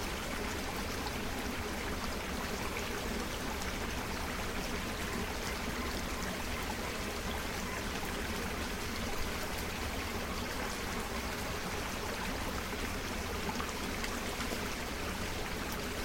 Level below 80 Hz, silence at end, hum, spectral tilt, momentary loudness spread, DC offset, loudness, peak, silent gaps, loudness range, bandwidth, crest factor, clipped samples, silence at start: -44 dBFS; 0 s; none; -3.5 dB/octave; 1 LU; under 0.1%; -37 LUFS; -20 dBFS; none; 0 LU; 16.5 kHz; 18 dB; under 0.1%; 0 s